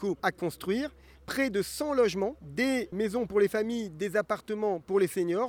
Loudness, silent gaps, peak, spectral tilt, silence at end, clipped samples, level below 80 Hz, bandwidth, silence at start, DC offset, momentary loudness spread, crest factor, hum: -30 LUFS; none; -12 dBFS; -5 dB/octave; 0 s; under 0.1%; -60 dBFS; over 20 kHz; 0 s; under 0.1%; 6 LU; 18 dB; none